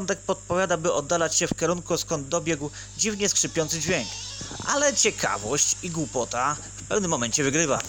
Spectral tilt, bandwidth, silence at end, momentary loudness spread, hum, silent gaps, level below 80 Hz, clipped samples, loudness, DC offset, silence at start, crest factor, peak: -2.5 dB/octave; 18 kHz; 0 s; 7 LU; none; none; -50 dBFS; under 0.1%; -24 LUFS; under 0.1%; 0 s; 18 dB; -8 dBFS